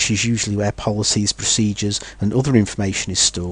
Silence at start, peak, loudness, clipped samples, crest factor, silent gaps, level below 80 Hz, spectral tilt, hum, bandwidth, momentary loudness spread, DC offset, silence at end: 0 s; -2 dBFS; -18 LUFS; under 0.1%; 18 dB; none; -40 dBFS; -3.5 dB/octave; none; 10.5 kHz; 5 LU; under 0.1%; 0 s